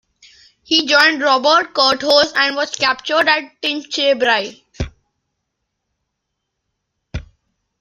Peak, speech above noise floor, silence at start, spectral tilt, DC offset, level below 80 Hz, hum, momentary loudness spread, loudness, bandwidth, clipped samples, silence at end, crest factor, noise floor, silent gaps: 0 dBFS; 60 dB; 0.7 s; -2.5 dB/octave; under 0.1%; -42 dBFS; none; 17 LU; -14 LUFS; 15 kHz; under 0.1%; 0.6 s; 18 dB; -76 dBFS; none